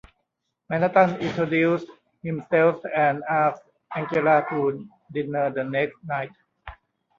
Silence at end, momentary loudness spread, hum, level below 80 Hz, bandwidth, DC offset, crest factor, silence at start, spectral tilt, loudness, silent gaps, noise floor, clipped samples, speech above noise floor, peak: 0.45 s; 14 LU; none; -60 dBFS; 7.2 kHz; under 0.1%; 20 dB; 0.7 s; -8 dB/octave; -23 LUFS; none; -78 dBFS; under 0.1%; 55 dB; -4 dBFS